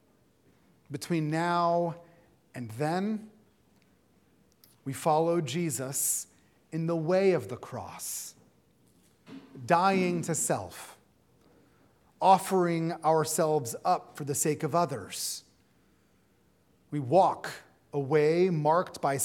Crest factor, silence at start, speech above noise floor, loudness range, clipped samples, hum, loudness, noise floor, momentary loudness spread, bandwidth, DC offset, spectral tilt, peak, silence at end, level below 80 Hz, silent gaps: 22 dB; 0.9 s; 39 dB; 5 LU; under 0.1%; none; -28 LUFS; -67 dBFS; 18 LU; 18 kHz; under 0.1%; -5 dB/octave; -8 dBFS; 0 s; -76 dBFS; none